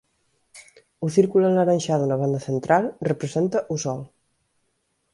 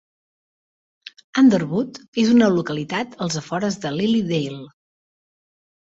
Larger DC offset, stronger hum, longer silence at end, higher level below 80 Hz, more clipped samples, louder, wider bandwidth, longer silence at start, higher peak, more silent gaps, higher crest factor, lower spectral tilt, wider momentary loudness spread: neither; neither; second, 1.05 s vs 1.25 s; about the same, -64 dBFS vs -62 dBFS; neither; about the same, -22 LUFS vs -20 LUFS; first, 11.5 kHz vs 8 kHz; second, 0.55 s vs 1.35 s; about the same, -4 dBFS vs -4 dBFS; second, none vs 2.08-2.13 s; about the same, 18 dB vs 18 dB; about the same, -6.5 dB/octave vs -5.5 dB/octave; about the same, 9 LU vs 11 LU